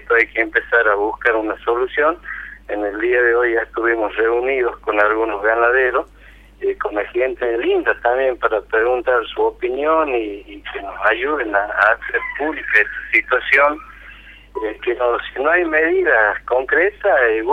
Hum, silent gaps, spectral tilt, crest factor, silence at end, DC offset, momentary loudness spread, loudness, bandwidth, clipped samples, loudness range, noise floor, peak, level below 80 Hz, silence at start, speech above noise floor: none; none; -5.5 dB/octave; 16 dB; 0 s; under 0.1%; 9 LU; -17 LUFS; 6.2 kHz; under 0.1%; 2 LU; -41 dBFS; 0 dBFS; -46 dBFS; 0 s; 23 dB